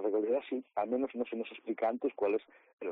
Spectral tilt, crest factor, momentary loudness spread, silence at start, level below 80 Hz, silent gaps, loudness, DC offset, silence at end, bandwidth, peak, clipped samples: -3.5 dB/octave; 14 dB; 7 LU; 0 s; -82 dBFS; 2.73-2.78 s; -35 LUFS; under 0.1%; 0 s; 4.2 kHz; -22 dBFS; under 0.1%